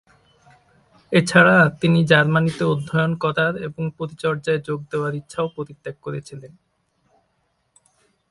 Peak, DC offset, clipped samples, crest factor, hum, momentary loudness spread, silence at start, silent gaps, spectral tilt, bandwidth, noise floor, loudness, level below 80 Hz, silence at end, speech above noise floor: 0 dBFS; under 0.1%; under 0.1%; 22 dB; none; 18 LU; 1.1 s; none; -6 dB/octave; 11.5 kHz; -69 dBFS; -19 LUFS; -58 dBFS; 1.85 s; 49 dB